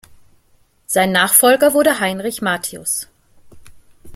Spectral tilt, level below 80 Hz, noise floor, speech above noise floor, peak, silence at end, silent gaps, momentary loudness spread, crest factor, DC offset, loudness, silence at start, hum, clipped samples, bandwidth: -2.5 dB/octave; -54 dBFS; -56 dBFS; 40 dB; 0 dBFS; 0 s; none; 11 LU; 18 dB; under 0.1%; -15 LUFS; 0.9 s; none; under 0.1%; 16.5 kHz